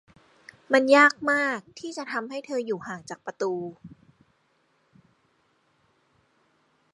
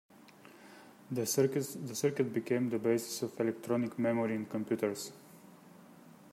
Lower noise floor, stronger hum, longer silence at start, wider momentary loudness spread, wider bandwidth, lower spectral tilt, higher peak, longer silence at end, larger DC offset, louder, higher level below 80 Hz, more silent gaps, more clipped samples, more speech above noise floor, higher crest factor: first, -68 dBFS vs -57 dBFS; neither; first, 0.7 s vs 0.25 s; first, 20 LU vs 13 LU; second, 11.5 kHz vs 16 kHz; about the same, -4 dB/octave vs -5 dB/octave; first, -4 dBFS vs -16 dBFS; first, 3.05 s vs 0 s; neither; first, -24 LUFS vs -34 LUFS; first, -74 dBFS vs -80 dBFS; neither; neither; first, 44 dB vs 24 dB; first, 24 dB vs 18 dB